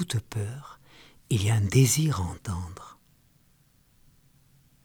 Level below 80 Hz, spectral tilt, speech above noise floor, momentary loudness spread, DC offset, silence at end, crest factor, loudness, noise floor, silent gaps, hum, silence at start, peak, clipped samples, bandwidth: -52 dBFS; -5 dB/octave; 37 dB; 21 LU; under 0.1%; 1.95 s; 20 dB; -26 LUFS; -63 dBFS; none; none; 0 s; -8 dBFS; under 0.1%; over 20 kHz